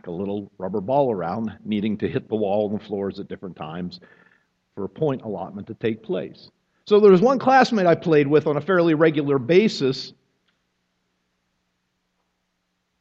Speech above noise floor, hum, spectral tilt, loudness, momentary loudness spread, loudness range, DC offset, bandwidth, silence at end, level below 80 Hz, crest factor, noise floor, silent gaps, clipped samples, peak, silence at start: 53 dB; none; -7 dB/octave; -21 LUFS; 17 LU; 12 LU; under 0.1%; 7.8 kHz; 2.9 s; -64 dBFS; 20 dB; -74 dBFS; none; under 0.1%; -2 dBFS; 0.05 s